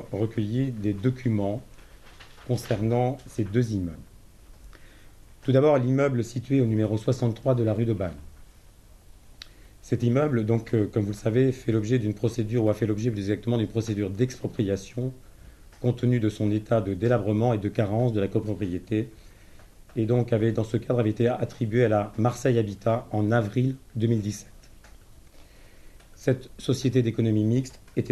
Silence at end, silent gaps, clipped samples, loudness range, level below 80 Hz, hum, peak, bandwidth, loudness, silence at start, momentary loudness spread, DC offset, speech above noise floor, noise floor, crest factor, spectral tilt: 0 s; none; under 0.1%; 5 LU; -50 dBFS; none; -8 dBFS; 12.5 kHz; -26 LUFS; 0 s; 8 LU; under 0.1%; 26 dB; -51 dBFS; 18 dB; -8 dB/octave